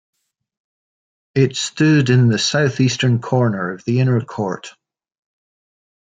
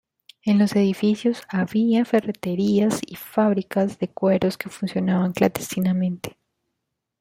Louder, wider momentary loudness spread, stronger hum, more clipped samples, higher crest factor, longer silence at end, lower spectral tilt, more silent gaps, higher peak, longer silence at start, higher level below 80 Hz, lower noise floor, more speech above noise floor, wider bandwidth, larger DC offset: first, -17 LUFS vs -22 LUFS; about the same, 10 LU vs 8 LU; neither; neither; about the same, 16 dB vs 18 dB; first, 1.4 s vs 0.9 s; about the same, -5.5 dB/octave vs -6.5 dB/octave; neither; about the same, -2 dBFS vs -4 dBFS; first, 1.35 s vs 0.45 s; about the same, -60 dBFS vs -62 dBFS; first, under -90 dBFS vs -80 dBFS; first, over 74 dB vs 59 dB; second, 9.2 kHz vs 16 kHz; neither